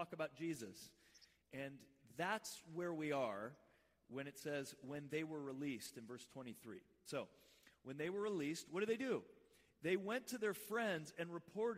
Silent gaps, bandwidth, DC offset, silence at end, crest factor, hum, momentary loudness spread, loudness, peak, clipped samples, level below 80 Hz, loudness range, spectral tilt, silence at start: none; 16 kHz; under 0.1%; 0 s; 20 dB; none; 14 LU; -46 LUFS; -28 dBFS; under 0.1%; -86 dBFS; 5 LU; -4.5 dB/octave; 0 s